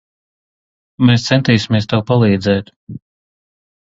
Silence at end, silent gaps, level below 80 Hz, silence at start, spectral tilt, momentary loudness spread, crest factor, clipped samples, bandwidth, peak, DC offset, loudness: 1 s; 2.76-2.87 s; -44 dBFS; 1 s; -6.5 dB/octave; 21 LU; 16 dB; under 0.1%; 7.8 kHz; 0 dBFS; under 0.1%; -14 LUFS